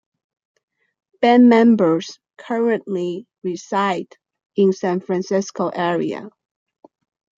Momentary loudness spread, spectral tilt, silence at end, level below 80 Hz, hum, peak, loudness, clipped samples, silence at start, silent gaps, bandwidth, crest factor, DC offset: 16 LU; -6 dB/octave; 1.1 s; -70 dBFS; none; -2 dBFS; -18 LUFS; under 0.1%; 1.2 s; 4.46-4.50 s; 7.6 kHz; 18 dB; under 0.1%